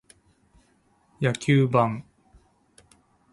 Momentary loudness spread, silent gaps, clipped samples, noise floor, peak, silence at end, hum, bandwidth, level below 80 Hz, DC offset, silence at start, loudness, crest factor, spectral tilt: 8 LU; none; under 0.1%; -64 dBFS; -6 dBFS; 1.3 s; none; 11.5 kHz; -60 dBFS; under 0.1%; 1.2 s; -23 LUFS; 22 dB; -7 dB/octave